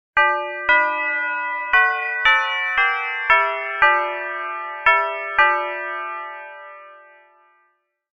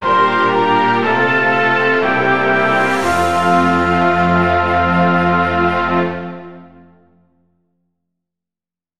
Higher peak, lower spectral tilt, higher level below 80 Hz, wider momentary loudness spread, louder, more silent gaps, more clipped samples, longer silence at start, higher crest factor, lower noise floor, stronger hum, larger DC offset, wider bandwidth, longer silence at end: about the same, -2 dBFS vs -2 dBFS; second, -2 dB/octave vs -6 dB/octave; second, -54 dBFS vs -42 dBFS; first, 12 LU vs 3 LU; second, -18 LUFS vs -14 LUFS; neither; neither; first, 0.15 s vs 0 s; first, 20 dB vs 14 dB; second, -66 dBFS vs under -90 dBFS; neither; second, under 0.1% vs 2%; second, 7.6 kHz vs 13.5 kHz; first, 1.15 s vs 0 s